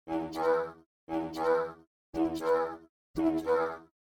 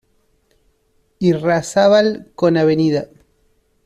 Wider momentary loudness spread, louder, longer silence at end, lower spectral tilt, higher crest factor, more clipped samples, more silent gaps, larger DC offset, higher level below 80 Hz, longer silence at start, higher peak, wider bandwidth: first, 12 LU vs 7 LU; second, -32 LUFS vs -16 LUFS; second, 0.3 s vs 0.8 s; about the same, -6 dB/octave vs -6 dB/octave; about the same, 16 dB vs 14 dB; neither; first, 0.86-1.07 s, 1.87-2.13 s, 2.89-3.14 s vs none; neither; second, -62 dBFS vs -56 dBFS; second, 0.05 s vs 1.2 s; second, -16 dBFS vs -2 dBFS; first, 16.5 kHz vs 13 kHz